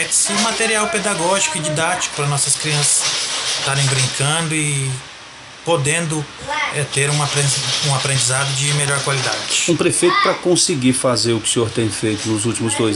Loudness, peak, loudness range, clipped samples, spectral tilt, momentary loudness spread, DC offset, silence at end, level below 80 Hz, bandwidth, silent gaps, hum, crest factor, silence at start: -16 LUFS; -2 dBFS; 3 LU; under 0.1%; -3 dB/octave; 6 LU; under 0.1%; 0 s; -52 dBFS; 15 kHz; none; none; 16 dB; 0 s